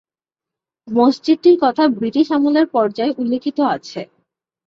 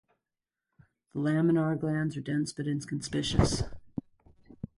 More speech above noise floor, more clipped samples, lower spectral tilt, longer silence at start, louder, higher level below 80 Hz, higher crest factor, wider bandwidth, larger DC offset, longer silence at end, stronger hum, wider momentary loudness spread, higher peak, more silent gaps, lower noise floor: first, 73 dB vs 61 dB; neither; about the same, -6 dB/octave vs -6 dB/octave; second, 0.85 s vs 1.15 s; first, -16 LUFS vs -30 LUFS; second, -64 dBFS vs -44 dBFS; second, 14 dB vs 22 dB; second, 7.4 kHz vs 11.5 kHz; neither; first, 0.6 s vs 0.1 s; neither; second, 8 LU vs 16 LU; first, -2 dBFS vs -10 dBFS; neither; about the same, -88 dBFS vs -89 dBFS